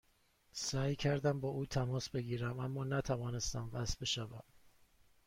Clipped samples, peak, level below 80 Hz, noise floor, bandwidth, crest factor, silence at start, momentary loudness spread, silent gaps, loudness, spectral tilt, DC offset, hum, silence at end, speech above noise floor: under 0.1%; -22 dBFS; -56 dBFS; -73 dBFS; 16 kHz; 16 dB; 0.55 s; 6 LU; none; -38 LUFS; -5 dB/octave; under 0.1%; none; 0.6 s; 35 dB